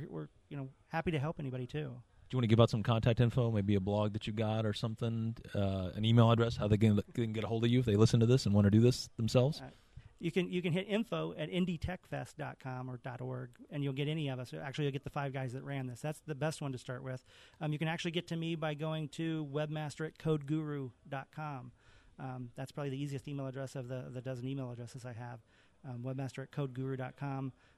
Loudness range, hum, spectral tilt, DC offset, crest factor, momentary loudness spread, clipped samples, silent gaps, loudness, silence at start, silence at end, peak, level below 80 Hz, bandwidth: 12 LU; none; -7 dB/octave; under 0.1%; 24 dB; 16 LU; under 0.1%; none; -35 LUFS; 0 s; 0.25 s; -10 dBFS; -60 dBFS; 12.5 kHz